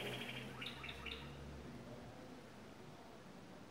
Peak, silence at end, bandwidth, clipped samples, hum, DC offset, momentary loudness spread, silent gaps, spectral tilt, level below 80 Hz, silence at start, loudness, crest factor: -32 dBFS; 0 s; 16 kHz; under 0.1%; none; under 0.1%; 10 LU; none; -4.5 dB/octave; -64 dBFS; 0 s; -51 LUFS; 20 dB